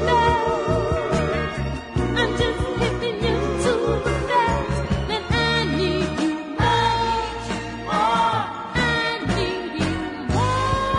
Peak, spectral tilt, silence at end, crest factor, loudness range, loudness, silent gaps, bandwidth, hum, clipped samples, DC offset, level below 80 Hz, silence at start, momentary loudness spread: -6 dBFS; -5.5 dB/octave; 0 s; 16 dB; 1 LU; -22 LUFS; none; 11 kHz; none; under 0.1%; under 0.1%; -34 dBFS; 0 s; 6 LU